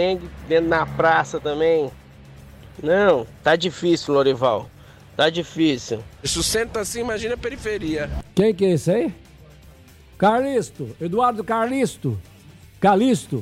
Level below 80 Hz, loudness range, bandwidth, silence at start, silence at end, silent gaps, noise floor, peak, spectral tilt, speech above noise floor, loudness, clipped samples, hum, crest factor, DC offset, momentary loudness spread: -44 dBFS; 3 LU; 15.5 kHz; 0 s; 0 s; none; -47 dBFS; -6 dBFS; -5 dB/octave; 27 dB; -21 LUFS; under 0.1%; none; 16 dB; under 0.1%; 10 LU